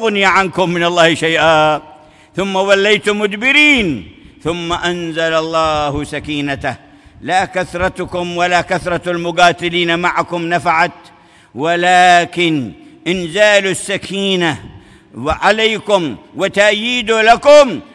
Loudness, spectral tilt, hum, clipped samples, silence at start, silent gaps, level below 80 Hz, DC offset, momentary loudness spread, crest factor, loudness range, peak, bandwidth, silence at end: -13 LUFS; -4 dB/octave; none; under 0.1%; 0 s; none; -42 dBFS; under 0.1%; 13 LU; 14 dB; 5 LU; 0 dBFS; 12 kHz; 0.1 s